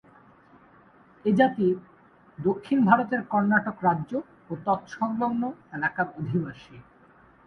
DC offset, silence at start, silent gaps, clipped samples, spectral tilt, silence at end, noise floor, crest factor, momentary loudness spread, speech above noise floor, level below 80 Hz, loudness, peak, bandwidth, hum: under 0.1%; 1.25 s; none; under 0.1%; -8.5 dB/octave; 0.65 s; -56 dBFS; 24 dB; 12 LU; 31 dB; -64 dBFS; -26 LUFS; -2 dBFS; 6.4 kHz; none